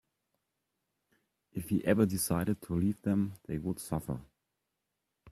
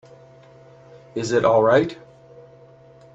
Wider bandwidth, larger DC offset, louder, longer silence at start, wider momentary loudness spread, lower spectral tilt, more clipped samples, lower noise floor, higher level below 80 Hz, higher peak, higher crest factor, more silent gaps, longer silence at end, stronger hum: first, 15.5 kHz vs 8 kHz; neither; second, -33 LUFS vs -19 LUFS; first, 1.55 s vs 1.15 s; second, 13 LU vs 17 LU; about the same, -6 dB/octave vs -6 dB/octave; neither; first, -85 dBFS vs -48 dBFS; about the same, -60 dBFS vs -60 dBFS; second, -14 dBFS vs -4 dBFS; about the same, 22 dB vs 20 dB; neither; second, 0 s vs 1.2 s; neither